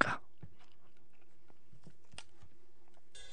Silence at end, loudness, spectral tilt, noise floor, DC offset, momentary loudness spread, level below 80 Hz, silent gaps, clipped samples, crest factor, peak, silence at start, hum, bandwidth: 0 s; -42 LUFS; -4 dB/octave; -71 dBFS; 0.9%; 23 LU; -74 dBFS; none; under 0.1%; 34 dB; -10 dBFS; 0 s; none; 10 kHz